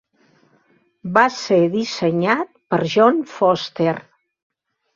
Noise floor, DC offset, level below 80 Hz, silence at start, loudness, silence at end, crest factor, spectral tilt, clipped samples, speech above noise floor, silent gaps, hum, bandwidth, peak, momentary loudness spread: -60 dBFS; under 0.1%; -64 dBFS; 1.05 s; -18 LUFS; 0.95 s; 18 dB; -5.5 dB/octave; under 0.1%; 42 dB; none; none; 7.6 kHz; -2 dBFS; 7 LU